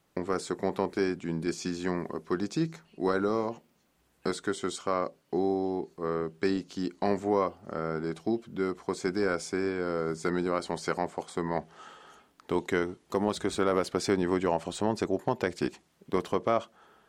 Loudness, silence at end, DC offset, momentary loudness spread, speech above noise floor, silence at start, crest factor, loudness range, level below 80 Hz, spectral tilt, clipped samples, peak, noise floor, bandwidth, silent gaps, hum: -31 LUFS; 0.4 s; under 0.1%; 6 LU; 39 dB; 0.15 s; 18 dB; 3 LU; -64 dBFS; -5.5 dB/octave; under 0.1%; -12 dBFS; -70 dBFS; 13 kHz; none; none